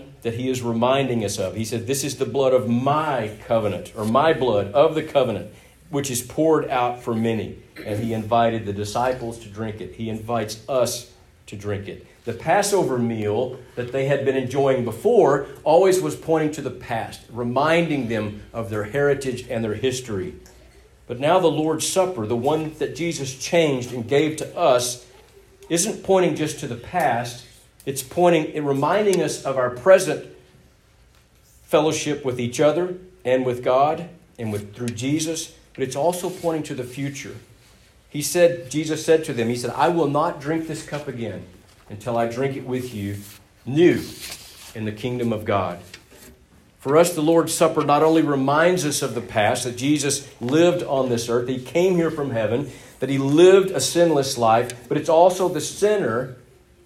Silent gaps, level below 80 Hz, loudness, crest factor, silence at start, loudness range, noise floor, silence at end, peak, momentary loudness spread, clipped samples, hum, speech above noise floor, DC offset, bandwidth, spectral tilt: none; -54 dBFS; -21 LUFS; 20 dB; 0 s; 6 LU; -54 dBFS; 0.5 s; -2 dBFS; 13 LU; under 0.1%; none; 34 dB; under 0.1%; 16 kHz; -5 dB/octave